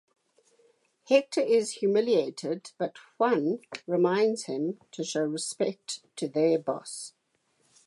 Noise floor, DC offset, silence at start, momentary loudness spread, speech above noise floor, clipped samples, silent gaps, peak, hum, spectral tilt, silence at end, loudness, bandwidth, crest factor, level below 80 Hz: -72 dBFS; under 0.1%; 1.1 s; 11 LU; 44 dB; under 0.1%; none; -10 dBFS; none; -4.5 dB/octave; 0.75 s; -28 LUFS; 11.5 kHz; 20 dB; -84 dBFS